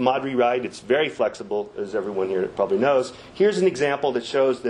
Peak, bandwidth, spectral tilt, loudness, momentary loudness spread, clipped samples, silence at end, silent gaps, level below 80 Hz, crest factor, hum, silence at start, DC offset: -4 dBFS; 10.5 kHz; -5 dB/octave; -23 LUFS; 8 LU; under 0.1%; 0 s; none; -62 dBFS; 18 dB; none; 0 s; under 0.1%